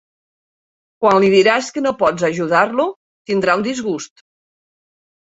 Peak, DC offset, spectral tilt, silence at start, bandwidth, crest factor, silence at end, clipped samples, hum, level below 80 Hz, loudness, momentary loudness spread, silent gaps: 0 dBFS; under 0.1%; -5 dB/octave; 1 s; 8 kHz; 18 dB; 1.2 s; under 0.1%; none; -58 dBFS; -16 LUFS; 12 LU; 2.96-3.25 s